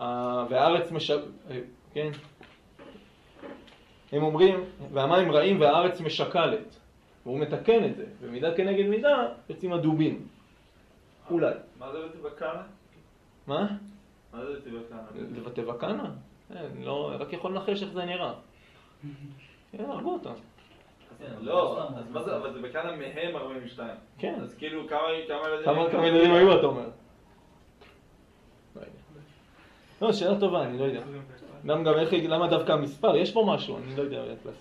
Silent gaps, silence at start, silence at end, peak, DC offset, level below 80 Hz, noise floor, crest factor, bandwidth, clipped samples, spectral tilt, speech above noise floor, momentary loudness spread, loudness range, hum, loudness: none; 0 s; 0 s; -6 dBFS; under 0.1%; -64 dBFS; -58 dBFS; 22 dB; 10.5 kHz; under 0.1%; -7 dB/octave; 31 dB; 21 LU; 12 LU; none; -27 LUFS